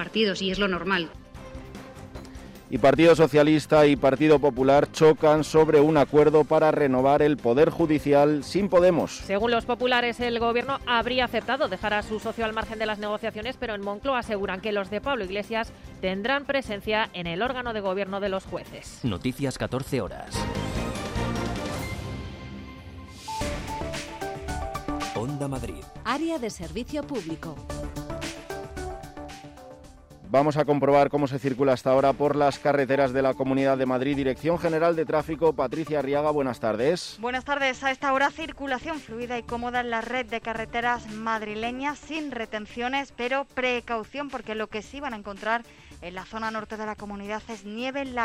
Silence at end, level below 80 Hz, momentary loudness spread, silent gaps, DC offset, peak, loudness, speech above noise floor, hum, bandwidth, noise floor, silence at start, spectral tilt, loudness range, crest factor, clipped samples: 0 s; -46 dBFS; 16 LU; none; under 0.1%; -10 dBFS; -25 LUFS; 24 dB; none; 15.5 kHz; -48 dBFS; 0 s; -5.5 dB/octave; 13 LU; 16 dB; under 0.1%